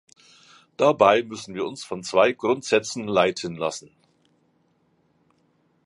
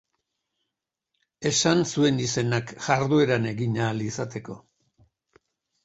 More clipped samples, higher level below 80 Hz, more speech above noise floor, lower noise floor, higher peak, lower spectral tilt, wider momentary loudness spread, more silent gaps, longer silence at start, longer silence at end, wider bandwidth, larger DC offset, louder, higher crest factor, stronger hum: neither; second, -66 dBFS vs -60 dBFS; second, 44 dB vs 61 dB; second, -66 dBFS vs -85 dBFS; first, -2 dBFS vs -6 dBFS; about the same, -4 dB/octave vs -4.5 dB/octave; about the same, 13 LU vs 12 LU; neither; second, 0.8 s vs 1.4 s; first, 2.05 s vs 1.25 s; first, 11.5 kHz vs 8.2 kHz; neither; about the same, -22 LUFS vs -24 LUFS; about the same, 22 dB vs 22 dB; neither